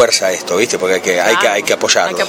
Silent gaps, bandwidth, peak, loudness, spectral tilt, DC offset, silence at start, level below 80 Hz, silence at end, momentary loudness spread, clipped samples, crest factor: none; 17 kHz; 0 dBFS; -13 LUFS; -1.5 dB/octave; under 0.1%; 0 s; -58 dBFS; 0 s; 4 LU; under 0.1%; 14 dB